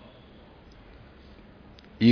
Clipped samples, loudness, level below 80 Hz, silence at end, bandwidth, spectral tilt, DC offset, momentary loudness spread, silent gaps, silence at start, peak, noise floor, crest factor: under 0.1%; -24 LUFS; -56 dBFS; 0 s; 5.4 kHz; -6 dB/octave; under 0.1%; 5 LU; none; 2 s; -8 dBFS; -51 dBFS; 22 dB